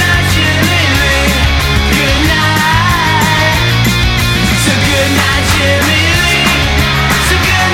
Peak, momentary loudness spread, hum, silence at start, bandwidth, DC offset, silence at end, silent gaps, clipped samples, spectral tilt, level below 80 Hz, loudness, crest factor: 0 dBFS; 2 LU; none; 0 s; 17.5 kHz; under 0.1%; 0 s; none; under 0.1%; -4 dB/octave; -18 dBFS; -9 LUFS; 10 dB